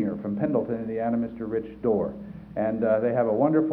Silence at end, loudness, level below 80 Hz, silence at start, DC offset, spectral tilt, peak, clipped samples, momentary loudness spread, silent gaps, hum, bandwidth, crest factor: 0 s; -26 LUFS; -56 dBFS; 0 s; under 0.1%; -11.5 dB/octave; -10 dBFS; under 0.1%; 8 LU; none; none; 4.1 kHz; 16 dB